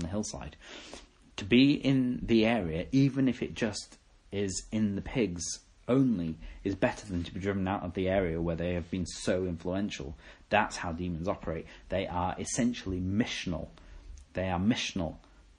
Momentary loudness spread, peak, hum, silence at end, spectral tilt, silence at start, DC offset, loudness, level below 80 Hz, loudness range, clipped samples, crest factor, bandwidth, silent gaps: 14 LU; -10 dBFS; none; 0.4 s; -5.5 dB/octave; 0 s; under 0.1%; -31 LUFS; -52 dBFS; 5 LU; under 0.1%; 22 dB; 10.5 kHz; none